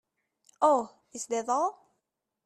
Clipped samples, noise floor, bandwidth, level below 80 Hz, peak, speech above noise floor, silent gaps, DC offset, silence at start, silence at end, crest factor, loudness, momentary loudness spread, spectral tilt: under 0.1%; -83 dBFS; 13 kHz; -80 dBFS; -12 dBFS; 56 dB; none; under 0.1%; 0.6 s; 0.75 s; 20 dB; -28 LUFS; 13 LU; -3 dB/octave